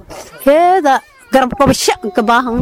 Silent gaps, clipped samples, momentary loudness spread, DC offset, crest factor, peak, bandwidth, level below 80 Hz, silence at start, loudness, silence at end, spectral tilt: none; under 0.1%; 7 LU; 0.2%; 12 dB; -2 dBFS; 17 kHz; -38 dBFS; 0.1 s; -12 LUFS; 0 s; -4 dB/octave